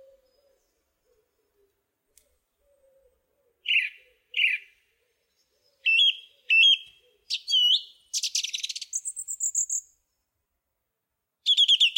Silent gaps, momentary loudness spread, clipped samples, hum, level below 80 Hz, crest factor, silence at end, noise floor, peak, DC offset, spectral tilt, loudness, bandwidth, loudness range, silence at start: none; 15 LU; under 0.1%; none; -82 dBFS; 18 dB; 0 s; -83 dBFS; -10 dBFS; under 0.1%; 7.5 dB/octave; -23 LUFS; 16.5 kHz; 9 LU; 3.65 s